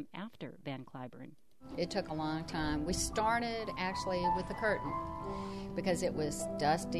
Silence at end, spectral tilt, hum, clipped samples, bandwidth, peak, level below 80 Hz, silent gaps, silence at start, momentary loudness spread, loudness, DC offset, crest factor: 0 s; -4.5 dB/octave; none; under 0.1%; 15 kHz; -20 dBFS; -52 dBFS; none; 0 s; 13 LU; -36 LUFS; 0.1%; 18 dB